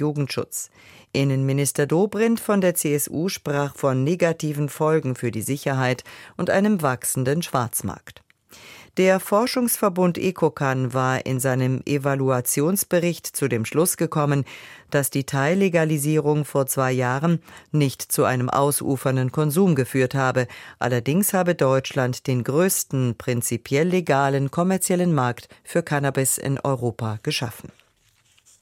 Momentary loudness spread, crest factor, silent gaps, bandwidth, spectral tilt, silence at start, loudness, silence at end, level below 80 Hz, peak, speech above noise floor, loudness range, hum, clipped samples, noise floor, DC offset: 7 LU; 16 dB; none; 16.5 kHz; -5.5 dB/octave; 0 s; -22 LUFS; 0.95 s; -60 dBFS; -6 dBFS; 40 dB; 2 LU; none; under 0.1%; -62 dBFS; under 0.1%